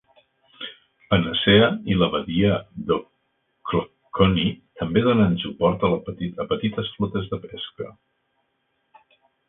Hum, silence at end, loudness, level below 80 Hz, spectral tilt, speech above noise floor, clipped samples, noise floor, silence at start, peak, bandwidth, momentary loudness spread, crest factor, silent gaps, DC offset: none; 1.6 s; -22 LUFS; -46 dBFS; -11 dB/octave; 50 dB; under 0.1%; -72 dBFS; 0.6 s; -2 dBFS; 4 kHz; 17 LU; 22 dB; none; under 0.1%